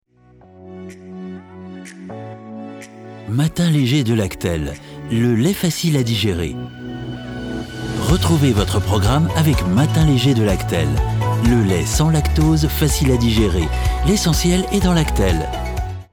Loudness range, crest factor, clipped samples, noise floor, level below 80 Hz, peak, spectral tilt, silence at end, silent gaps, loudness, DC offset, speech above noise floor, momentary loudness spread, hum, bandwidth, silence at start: 5 LU; 14 dB; under 0.1%; -48 dBFS; -26 dBFS; -2 dBFS; -5.5 dB/octave; 0.1 s; none; -17 LUFS; under 0.1%; 32 dB; 18 LU; none; 19.5 kHz; 0.6 s